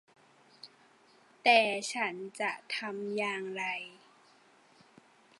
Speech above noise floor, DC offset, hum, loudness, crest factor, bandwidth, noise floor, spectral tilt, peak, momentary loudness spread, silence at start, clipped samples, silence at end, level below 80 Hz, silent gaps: 31 dB; under 0.1%; none; -31 LUFS; 26 dB; 11.5 kHz; -63 dBFS; -2.5 dB/octave; -10 dBFS; 28 LU; 0.65 s; under 0.1%; 1.5 s; under -90 dBFS; none